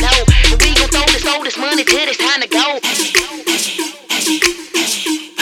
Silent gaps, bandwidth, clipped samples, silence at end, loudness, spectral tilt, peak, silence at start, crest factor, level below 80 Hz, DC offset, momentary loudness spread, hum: none; 17.5 kHz; under 0.1%; 0 s; -13 LUFS; -2.5 dB/octave; 0 dBFS; 0 s; 14 dB; -20 dBFS; under 0.1%; 7 LU; none